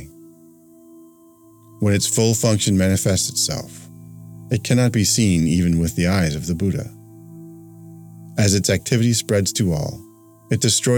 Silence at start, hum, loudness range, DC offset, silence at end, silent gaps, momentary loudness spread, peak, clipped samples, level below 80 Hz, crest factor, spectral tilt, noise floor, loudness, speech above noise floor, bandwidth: 0 s; none; 3 LU; under 0.1%; 0 s; none; 23 LU; -4 dBFS; under 0.1%; -44 dBFS; 16 dB; -4.5 dB/octave; -49 dBFS; -19 LUFS; 31 dB; 19 kHz